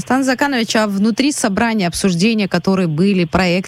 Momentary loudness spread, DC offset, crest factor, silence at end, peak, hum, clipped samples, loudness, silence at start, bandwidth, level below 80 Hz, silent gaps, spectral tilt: 2 LU; under 0.1%; 12 dB; 0 s; -4 dBFS; none; under 0.1%; -15 LUFS; 0 s; 14.5 kHz; -42 dBFS; none; -5 dB/octave